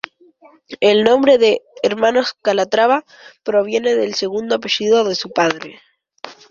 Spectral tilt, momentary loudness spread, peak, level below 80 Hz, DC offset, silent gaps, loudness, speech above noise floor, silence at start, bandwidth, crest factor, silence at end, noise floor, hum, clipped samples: -3.5 dB/octave; 18 LU; 0 dBFS; -60 dBFS; under 0.1%; none; -16 LUFS; 33 dB; 0.7 s; 7.4 kHz; 16 dB; 0.2 s; -49 dBFS; none; under 0.1%